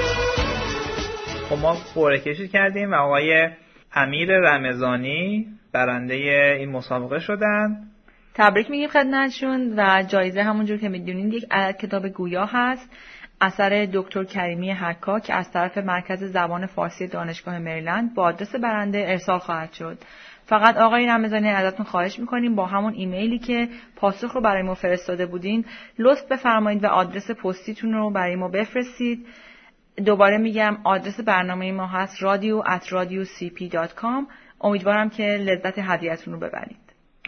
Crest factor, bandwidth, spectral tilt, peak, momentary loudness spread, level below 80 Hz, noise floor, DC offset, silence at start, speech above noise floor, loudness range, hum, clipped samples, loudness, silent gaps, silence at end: 22 dB; 6.6 kHz; -6 dB/octave; 0 dBFS; 11 LU; -48 dBFS; -51 dBFS; under 0.1%; 0 s; 29 dB; 5 LU; none; under 0.1%; -22 LUFS; none; 0 s